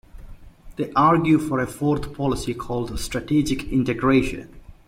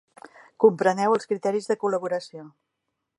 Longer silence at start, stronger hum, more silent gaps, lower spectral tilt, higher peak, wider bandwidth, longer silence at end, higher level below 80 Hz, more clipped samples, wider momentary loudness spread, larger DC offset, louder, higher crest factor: second, 0.15 s vs 0.6 s; neither; neither; about the same, -6.5 dB/octave vs -5.5 dB/octave; about the same, -6 dBFS vs -4 dBFS; first, 16 kHz vs 11 kHz; second, 0.15 s vs 0.7 s; first, -40 dBFS vs -80 dBFS; neither; about the same, 11 LU vs 12 LU; neither; about the same, -22 LUFS vs -24 LUFS; second, 16 dB vs 22 dB